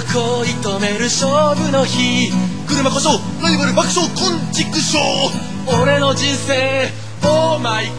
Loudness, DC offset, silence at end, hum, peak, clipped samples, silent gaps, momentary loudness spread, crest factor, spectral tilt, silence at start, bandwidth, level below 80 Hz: -16 LUFS; 3%; 0 s; none; -2 dBFS; under 0.1%; none; 5 LU; 14 dB; -4 dB/octave; 0 s; 11 kHz; -46 dBFS